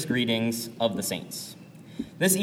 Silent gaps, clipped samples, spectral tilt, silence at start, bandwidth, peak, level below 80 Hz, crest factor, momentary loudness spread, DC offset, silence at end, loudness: none; under 0.1%; -3.5 dB/octave; 0 s; 17.5 kHz; -8 dBFS; -64 dBFS; 20 dB; 16 LU; under 0.1%; 0 s; -28 LUFS